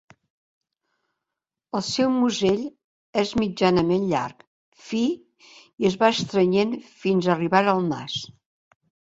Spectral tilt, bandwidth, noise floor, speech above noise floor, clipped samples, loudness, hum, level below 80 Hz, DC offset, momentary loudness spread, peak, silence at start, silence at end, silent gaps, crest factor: -5.5 dB/octave; 8 kHz; -87 dBFS; 65 dB; under 0.1%; -23 LUFS; none; -58 dBFS; under 0.1%; 11 LU; -2 dBFS; 1.75 s; 0.85 s; 2.84-3.13 s, 4.47-4.72 s; 22 dB